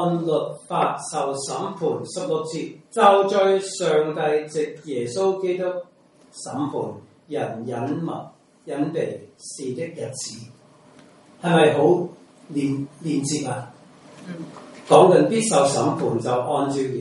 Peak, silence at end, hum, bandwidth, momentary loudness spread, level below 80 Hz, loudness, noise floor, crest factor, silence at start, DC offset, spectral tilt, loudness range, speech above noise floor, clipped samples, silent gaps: 0 dBFS; 0 s; none; 11.5 kHz; 17 LU; -68 dBFS; -22 LUFS; -50 dBFS; 22 dB; 0 s; under 0.1%; -5 dB/octave; 9 LU; 29 dB; under 0.1%; none